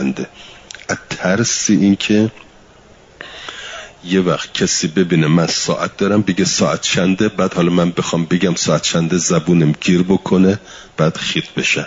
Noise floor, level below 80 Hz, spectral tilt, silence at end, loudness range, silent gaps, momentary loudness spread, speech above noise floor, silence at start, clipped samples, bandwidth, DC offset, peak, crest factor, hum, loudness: -45 dBFS; -50 dBFS; -4.5 dB/octave; 0 s; 3 LU; none; 16 LU; 29 dB; 0 s; under 0.1%; 7.8 kHz; under 0.1%; -2 dBFS; 14 dB; none; -15 LUFS